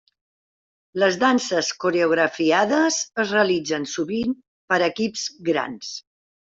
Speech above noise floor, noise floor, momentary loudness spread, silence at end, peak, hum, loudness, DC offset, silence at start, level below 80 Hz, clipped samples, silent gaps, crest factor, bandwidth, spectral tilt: over 69 dB; under -90 dBFS; 11 LU; 0.5 s; -4 dBFS; none; -21 LUFS; under 0.1%; 0.95 s; -64 dBFS; under 0.1%; 4.48-4.68 s; 20 dB; 8 kHz; -3.5 dB/octave